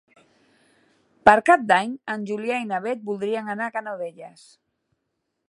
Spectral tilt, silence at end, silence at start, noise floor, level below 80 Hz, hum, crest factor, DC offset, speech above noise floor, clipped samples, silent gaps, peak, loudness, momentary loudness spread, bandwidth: -5 dB/octave; 1.2 s; 1.25 s; -78 dBFS; -62 dBFS; none; 24 dB; under 0.1%; 55 dB; under 0.1%; none; 0 dBFS; -22 LUFS; 14 LU; 11.5 kHz